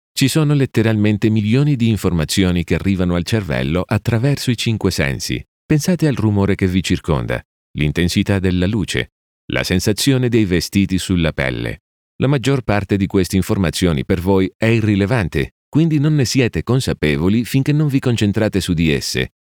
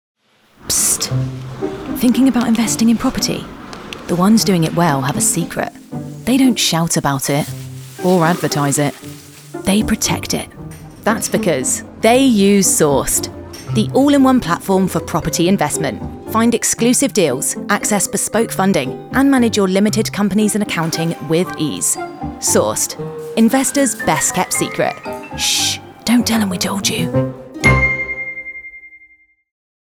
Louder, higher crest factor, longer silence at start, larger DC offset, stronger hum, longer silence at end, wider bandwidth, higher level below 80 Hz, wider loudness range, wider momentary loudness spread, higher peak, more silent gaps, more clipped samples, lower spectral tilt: about the same, -17 LUFS vs -15 LUFS; about the same, 16 dB vs 16 dB; second, 0.15 s vs 0.65 s; neither; neither; second, 0.35 s vs 1 s; about the same, 19.5 kHz vs over 20 kHz; about the same, -38 dBFS vs -40 dBFS; about the same, 2 LU vs 3 LU; second, 6 LU vs 13 LU; about the same, -2 dBFS vs 0 dBFS; first, 5.48-5.69 s, 7.45-7.74 s, 9.12-9.48 s, 11.80-12.19 s, 14.55-14.60 s, 15.52-15.72 s vs none; neither; first, -6 dB/octave vs -4 dB/octave